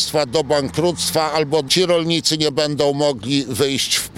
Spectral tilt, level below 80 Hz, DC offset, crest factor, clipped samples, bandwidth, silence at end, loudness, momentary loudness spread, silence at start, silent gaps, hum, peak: -3.5 dB/octave; -50 dBFS; under 0.1%; 16 dB; under 0.1%; 17 kHz; 0 s; -18 LUFS; 4 LU; 0 s; none; none; -2 dBFS